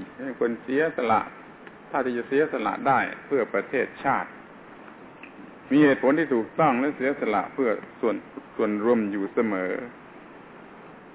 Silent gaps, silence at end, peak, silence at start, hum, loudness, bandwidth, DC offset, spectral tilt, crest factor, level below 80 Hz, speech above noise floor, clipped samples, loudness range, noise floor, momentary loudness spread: none; 0 s; -8 dBFS; 0 s; none; -25 LUFS; 4 kHz; under 0.1%; -10 dB/octave; 18 dB; -66 dBFS; 21 dB; under 0.1%; 4 LU; -46 dBFS; 23 LU